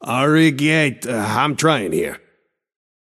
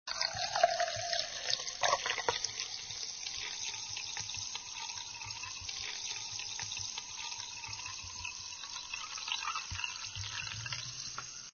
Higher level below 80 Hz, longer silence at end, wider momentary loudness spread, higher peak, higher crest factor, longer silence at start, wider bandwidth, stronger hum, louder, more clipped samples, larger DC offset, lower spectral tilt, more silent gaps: first, -58 dBFS vs -64 dBFS; first, 1 s vs 0 s; about the same, 9 LU vs 9 LU; first, -2 dBFS vs -12 dBFS; second, 18 dB vs 28 dB; about the same, 0 s vs 0.05 s; first, 14.5 kHz vs 7 kHz; neither; first, -17 LUFS vs -37 LUFS; neither; neither; first, -5 dB/octave vs 0 dB/octave; neither